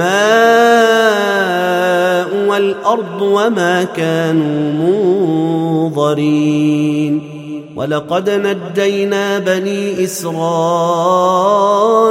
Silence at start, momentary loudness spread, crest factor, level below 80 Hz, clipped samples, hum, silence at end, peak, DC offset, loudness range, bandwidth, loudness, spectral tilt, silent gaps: 0 s; 8 LU; 12 dB; -62 dBFS; under 0.1%; none; 0 s; 0 dBFS; under 0.1%; 4 LU; 16.5 kHz; -13 LUFS; -5.5 dB/octave; none